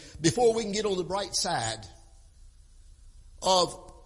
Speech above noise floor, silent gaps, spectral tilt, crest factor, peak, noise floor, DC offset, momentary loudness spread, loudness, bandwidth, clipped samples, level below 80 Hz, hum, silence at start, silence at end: 26 dB; none; -3.5 dB/octave; 20 dB; -10 dBFS; -53 dBFS; under 0.1%; 8 LU; -27 LUFS; 11.5 kHz; under 0.1%; -52 dBFS; none; 0 s; 0.1 s